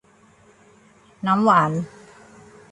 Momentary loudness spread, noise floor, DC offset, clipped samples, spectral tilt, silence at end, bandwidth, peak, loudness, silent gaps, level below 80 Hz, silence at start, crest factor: 14 LU; -54 dBFS; under 0.1%; under 0.1%; -7 dB/octave; 0.85 s; 11 kHz; -4 dBFS; -19 LUFS; none; -64 dBFS; 1.25 s; 20 dB